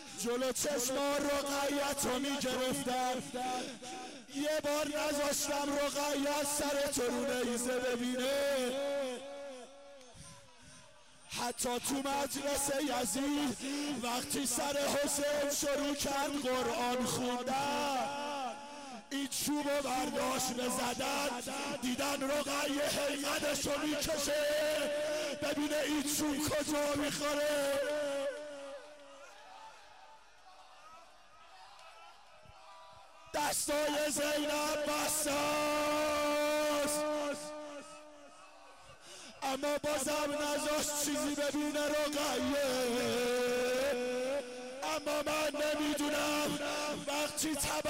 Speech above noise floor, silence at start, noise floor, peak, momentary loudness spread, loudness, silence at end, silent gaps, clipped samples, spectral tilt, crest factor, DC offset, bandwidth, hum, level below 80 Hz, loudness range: 25 dB; 0 s; -60 dBFS; -26 dBFS; 14 LU; -34 LUFS; 0 s; none; under 0.1%; -2 dB/octave; 8 dB; under 0.1%; 16 kHz; none; -62 dBFS; 5 LU